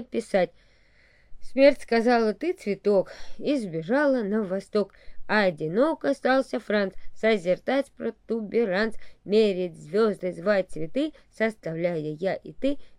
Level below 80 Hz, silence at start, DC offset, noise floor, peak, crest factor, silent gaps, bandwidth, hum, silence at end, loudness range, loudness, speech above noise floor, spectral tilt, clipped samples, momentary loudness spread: -52 dBFS; 0 s; under 0.1%; -58 dBFS; -6 dBFS; 20 dB; none; 11.5 kHz; none; 0.05 s; 2 LU; -26 LUFS; 33 dB; -6 dB/octave; under 0.1%; 9 LU